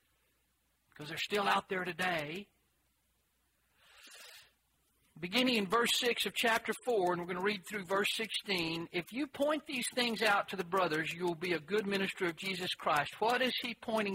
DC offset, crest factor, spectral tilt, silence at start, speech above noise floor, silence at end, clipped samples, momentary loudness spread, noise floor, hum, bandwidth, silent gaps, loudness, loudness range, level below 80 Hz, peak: under 0.1%; 20 dB; -3.5 dB/octave; 1 s; 43 dB; 0 s; under 0.1%; 9 LU; -77 dBFS; none; 16 kHz; none; -34 LUFS; 6 LU; -74 dBFS; -16 dBFS